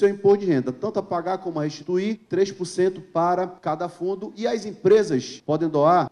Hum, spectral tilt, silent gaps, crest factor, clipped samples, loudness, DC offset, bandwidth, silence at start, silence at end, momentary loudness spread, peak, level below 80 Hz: none; -6.5 dB/octave; none; 14 dB; under 0.1%; -23 LUFS; under 0.1%; 10.5 kHz; 0 s; 0.05 s; 9 LU; -8 dBFS; -66 dBFS